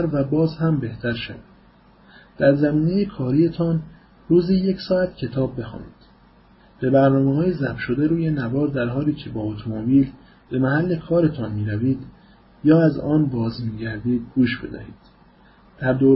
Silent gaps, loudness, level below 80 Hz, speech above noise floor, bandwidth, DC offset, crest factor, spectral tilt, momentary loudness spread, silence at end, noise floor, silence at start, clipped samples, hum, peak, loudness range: none; -21 LUFS; -48 dBFS; 32 dB; 5.8 kHz; under 0.1%; 18 dB; -12.5 dB/octave; 11 LU; 0 s; -52 dBFS; 0 s; under 0.1%; none; -4 dBFS; 2 LU